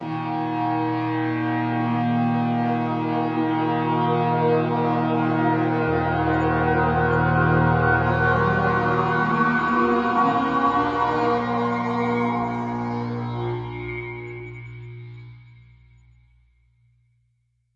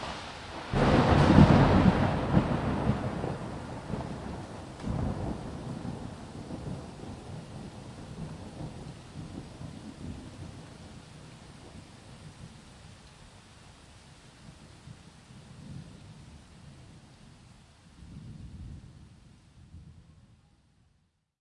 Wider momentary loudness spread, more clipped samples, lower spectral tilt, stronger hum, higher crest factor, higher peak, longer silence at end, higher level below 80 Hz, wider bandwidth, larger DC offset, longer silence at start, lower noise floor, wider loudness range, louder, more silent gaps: second, 11 LU vs 28 LU; neither; about the same, -8.5 dB/octave vs -7.5 dB/octave; neither; second, 14 dB vs 28 dB; second, -8 dBFS vs -4 dBFS; first, 2.3 s vs 1.5 s; about the same, -46 dBFS vs -44 dBFS; second, 7.4 kHz vs 11.5 kHz; neither; about the same, 0 s vs 0 s; about the same, -69 dBFS vs -72 dBFS; second, 12 LU vs 26 LU; first, -22 LUFS vs -28 LUFS; neither